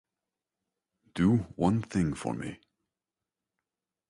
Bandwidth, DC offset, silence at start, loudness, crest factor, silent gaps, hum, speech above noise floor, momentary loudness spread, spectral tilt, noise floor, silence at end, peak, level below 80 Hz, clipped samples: 11.5 kHz; under 0.1%; 1.15 s; -29 LUFS; 20 dB; none; none; over 62 dB; 13 LU; -7.5 dB/octave; under -90 dBFS; 1.55 s; -14 dBFS; -54 dBFS; under 0.1%